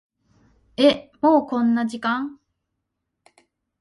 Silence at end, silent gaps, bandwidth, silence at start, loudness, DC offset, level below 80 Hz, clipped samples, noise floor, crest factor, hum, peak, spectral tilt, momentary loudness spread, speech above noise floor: 1.45 s; none; 11.5 kHz; 0.8 s; -20 LUFS; under 0.1%; -64 dBFS; under 0.1%; -79 dBFS; 20 dB; none; -4 dBFS; -5.5 dB/octave; 10 LU; 59 dB